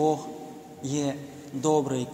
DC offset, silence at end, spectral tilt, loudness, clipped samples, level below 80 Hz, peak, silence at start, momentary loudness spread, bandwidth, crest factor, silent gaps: under 0.1%; 0 s; -5.5 dB/octave; -29 LUFS; under 0.1%; -70 dBFS; -10 dBFS; 0 s; 15 LU; 16 kHz; 18 dB; none